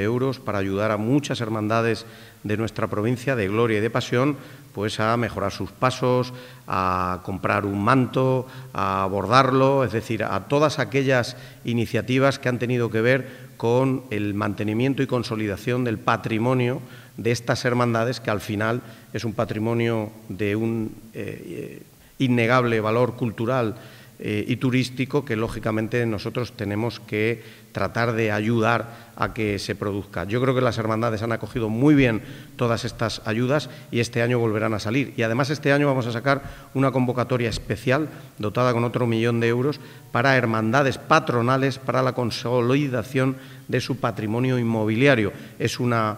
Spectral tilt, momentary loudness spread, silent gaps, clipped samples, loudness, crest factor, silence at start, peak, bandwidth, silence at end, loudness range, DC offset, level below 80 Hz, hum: -6.5 dB/octave; 9 LU; none; under 0.1%; -23 LUFS; 22 dB; 0 s; 0 dBFS; 16 kHz; 0 s; 4 LU; under 0.1%; -52 dBFS; none